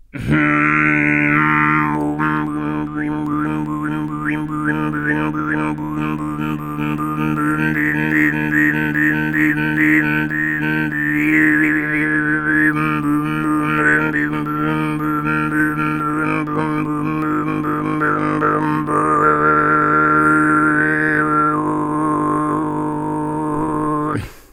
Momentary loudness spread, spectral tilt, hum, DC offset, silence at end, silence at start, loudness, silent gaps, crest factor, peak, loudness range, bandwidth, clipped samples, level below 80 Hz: 8 LU; -7 dB/octave; none; under 0.1%; 0.15 s; 0.15 s; -17 LUFS; none; 18 dB; 0 dBFS; 6 LU; 13.5 kHz; under 0.1%; -44 dBFS